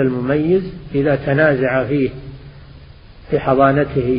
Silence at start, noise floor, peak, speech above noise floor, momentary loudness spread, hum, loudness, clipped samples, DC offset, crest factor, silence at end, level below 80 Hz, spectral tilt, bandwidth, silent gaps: 0 s; -40 dBFS; 0 dBFS; 24 dB; 9 LU; none; -16 LUFS; under 0.1%; under 0.1%; 16 dB; 0 s; -40 dBFS; -12.5 dB/octave; 5.2 kHz; none